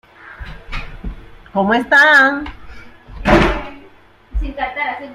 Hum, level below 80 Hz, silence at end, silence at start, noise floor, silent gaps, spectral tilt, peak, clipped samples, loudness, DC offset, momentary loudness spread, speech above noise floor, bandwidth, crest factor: none; -28 dBFS; 0 s; 0.25 s; -45 dBFS; none; -5.5 dB/octave; 0 dBFS; under 0.1%; -14 LUFS; under 0.1%; 25 LU; 31 dB; 15 kHz; 18 dB